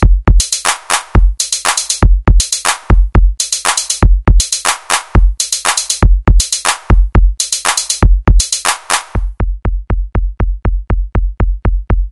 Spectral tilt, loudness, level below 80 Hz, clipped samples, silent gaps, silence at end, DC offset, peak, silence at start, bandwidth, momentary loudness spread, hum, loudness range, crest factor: -3 dB/octave; -13 LUFS; -12 dBFS; 0.8%; none; 0 s; under 0.1%; 0 dBFS; 0 s; 12 kHz; 7 LU; none; 4 LU; 10 dB